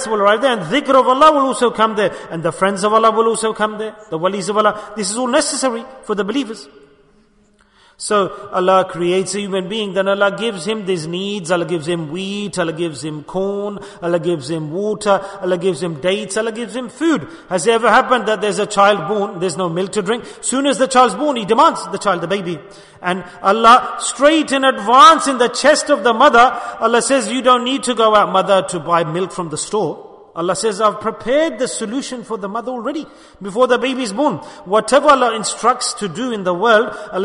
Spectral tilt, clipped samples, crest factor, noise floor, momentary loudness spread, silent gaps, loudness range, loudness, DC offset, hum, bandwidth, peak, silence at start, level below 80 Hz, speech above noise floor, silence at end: -3.5 dB/octave; under 0.1%; 16 dB; -54 dBFS; 11 LU; none; 8 LU; -16 LUFS; under 0.1%; none; 11 kHz; 0 dBFS; 0 s; -54 dBFS; 38 dB; 0 s